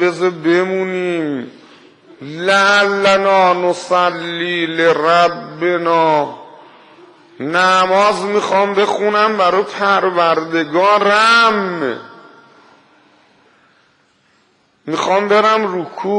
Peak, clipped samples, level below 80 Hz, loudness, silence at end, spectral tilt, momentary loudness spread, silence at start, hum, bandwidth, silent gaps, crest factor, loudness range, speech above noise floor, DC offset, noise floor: 0 dBFS; under 0.1%; -64 dBFS; -14 LUFS; 0 s; -4 dB/octave; 11 LU; 0 s; none; 10.5 kHz; none; 14 dB; 6 LU; 43 dB; under 0.1%; -57 dBFS